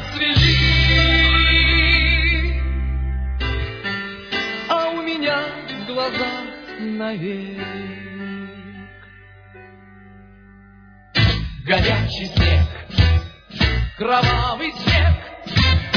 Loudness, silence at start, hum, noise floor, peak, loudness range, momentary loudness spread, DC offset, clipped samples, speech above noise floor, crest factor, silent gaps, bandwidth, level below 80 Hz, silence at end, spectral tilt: -18 LUFS; 0 s; none; -46 dBFS; -2 dBFS; 15 LU; 16 LU; under 0.1%; under 0.1%; 27 dB; 18 dB; none; 5.4 kHz; -24 dBFS; 0 s; -6 dB/octave